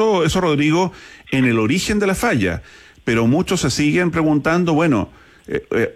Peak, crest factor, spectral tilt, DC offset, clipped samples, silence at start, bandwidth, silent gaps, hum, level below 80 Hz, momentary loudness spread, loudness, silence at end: -6 dBFS; 10 dB; -5.5 dB/octave; under 0.1%; under 0.1%; 0 s; 15.5 kHz; none; none; -42 dBFS; 8 LU; -17 LUFS; 0.05 s